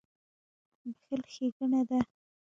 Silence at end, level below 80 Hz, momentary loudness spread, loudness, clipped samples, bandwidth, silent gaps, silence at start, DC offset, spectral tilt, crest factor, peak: 0.5 s; -68 dBFS; 17 LU; -33 LUFS; under 0.1%; 7.6 kHz; 1.52-1.60 s; 0.85 s; under 0.1%; -6.5 dB/octave; 22 dB; -14 dBFS